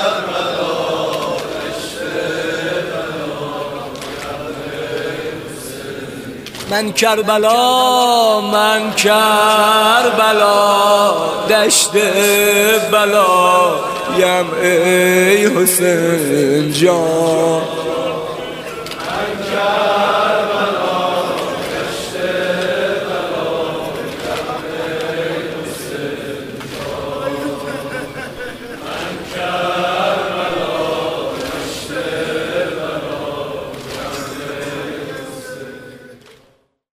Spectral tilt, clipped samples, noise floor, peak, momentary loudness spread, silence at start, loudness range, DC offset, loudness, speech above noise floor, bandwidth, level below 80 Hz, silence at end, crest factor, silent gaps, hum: -3 dB/octave; under 0.1%; -55 dBFS; 0 dBFS; 15 LU; 0 s; 13 LU; under 0.1%; -15 LUFS; 43 dB; 16 kHz; -50 dBFS; 0.65 s; 16 dB; none; none